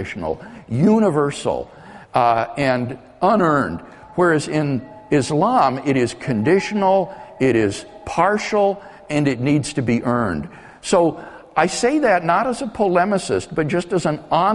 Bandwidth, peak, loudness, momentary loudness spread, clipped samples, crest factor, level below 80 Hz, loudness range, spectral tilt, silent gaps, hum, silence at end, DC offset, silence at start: 11.5 kHz; -2 dBFS; -19 LUFS; 11 LU; under 0.1%; 18 dB; -50 dBFS; 2 LU; -6 dB/octave; none; none; 0 s; under 0.1%; 0 s